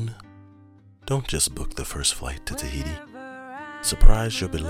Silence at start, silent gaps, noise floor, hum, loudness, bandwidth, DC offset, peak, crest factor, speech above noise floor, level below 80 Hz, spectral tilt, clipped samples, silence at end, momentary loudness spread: 0 s; none; -51 dBFS; none; -26 LUFS; 15 kHz; under 0.1%; 0 dBFS; 22 dB; 32 dB; -24 dBFS; -3.5 dB/octave; under 0.1%; 0 s; 17 LU